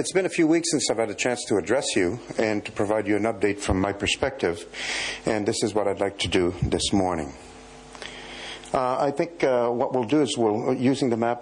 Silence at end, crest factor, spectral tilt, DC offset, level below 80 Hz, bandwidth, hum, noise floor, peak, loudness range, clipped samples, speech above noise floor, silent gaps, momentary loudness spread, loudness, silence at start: 0 s; 14 dB; -4.5 dB/octave; under 0.1%; -48 dBFS; 11 kHz; none; -44 dBFS; -10 dBFS; 3 LU; under 0.1%; 20 dB; none; 14 LU; -24 LUFS; 0 s